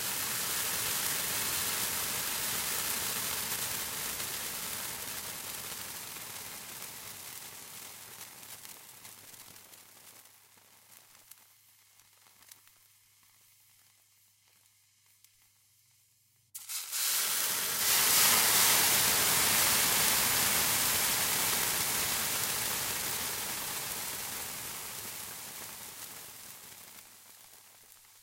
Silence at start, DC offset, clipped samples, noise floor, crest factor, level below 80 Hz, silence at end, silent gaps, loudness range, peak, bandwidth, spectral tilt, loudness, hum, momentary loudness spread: 0 s; under 0.1%; under 0.1%; -69 dBFS; 26 dB; -64 dBFS; 0.55 s; none; 21 LU; -8 dBFS; 16 kHz; 0 dB/octave; -29 LUFS; none; 22 LU